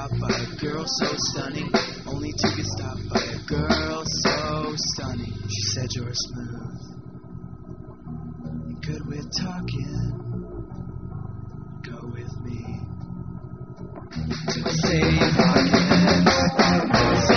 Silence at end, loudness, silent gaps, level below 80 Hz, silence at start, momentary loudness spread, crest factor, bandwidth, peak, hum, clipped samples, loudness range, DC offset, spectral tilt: 0 s; -23 LUFS; none; -40 dBFS; 0 s; 20 LU; 20 dB; 6.8 kHz; -4 dBFS; none; under 0.1%; 14 LU; 0.4%; -4.5 dB/octave